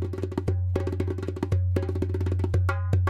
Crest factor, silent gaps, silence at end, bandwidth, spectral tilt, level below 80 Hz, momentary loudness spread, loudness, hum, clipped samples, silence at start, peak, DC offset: 16 dB; none; 0 s; 7.8 kHz; -8.5 dB/octave; -40 dBFS; 5 LU; -28 LUFS; none; under 0.1%; 0 s; -10 dBFS; under 0.1%